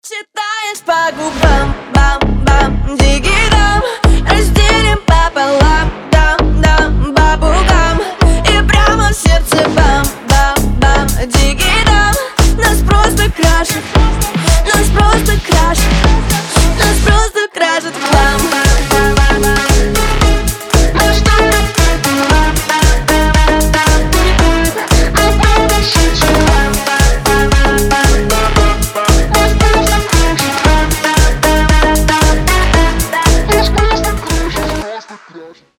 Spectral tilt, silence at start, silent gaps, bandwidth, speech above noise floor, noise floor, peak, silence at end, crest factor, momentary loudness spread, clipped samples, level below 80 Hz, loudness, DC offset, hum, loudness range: -4 dB/octave; 0.05 s; none; 17.5 kHz; 23 dB; -35 dBFS; 0 dBFS; 0.3 s; 10 dB; 4 LU; under 0.1%; -12 dBFS; -11 LUFS; under 0.1%; none; 1 LU